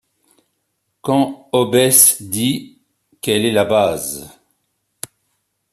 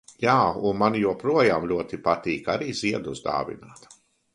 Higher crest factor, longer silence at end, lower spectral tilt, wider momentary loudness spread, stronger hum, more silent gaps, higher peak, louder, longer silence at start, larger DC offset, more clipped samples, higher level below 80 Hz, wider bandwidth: about the same, 18 dB vs 20 dB; first, 1.45 s vs 0.6 s; second, -3 dB/octave vs -5.5 dB/octave; first, 23 LU vs 8 LU; neither; neither; first, 0 dBFS vs -4 dBFS; first, -15 LUFS vs -24 LUFS; first, 1.05 s vs 0.2 s; neither; neither; about the same, -58 dBFS vs -56 dBFS; first, 14.5 kHz vs 11.5 kHz